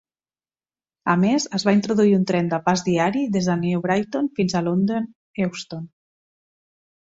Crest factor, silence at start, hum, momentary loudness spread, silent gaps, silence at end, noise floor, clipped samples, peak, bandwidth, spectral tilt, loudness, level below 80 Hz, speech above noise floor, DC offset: 18 dB; 1.05 s; none; 11 LU; 5.15-5.34 s; 1.2 s; under -90 dBFS; under 0.1%; -6 dBFS; 7.8 kHz; -6 dB/octave; -21 LUFS; -60 dBFS; over 70 dB; under 0.1%